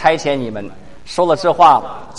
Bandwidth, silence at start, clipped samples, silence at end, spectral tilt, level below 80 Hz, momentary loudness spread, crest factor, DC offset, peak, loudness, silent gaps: 11.5 kHz; 0 s; under 0.1%; 0 s; -5 dB/octave; -46 dBFS; 17 LU; 16 dB; 2%; 0 dBFS; -14 LUFS; none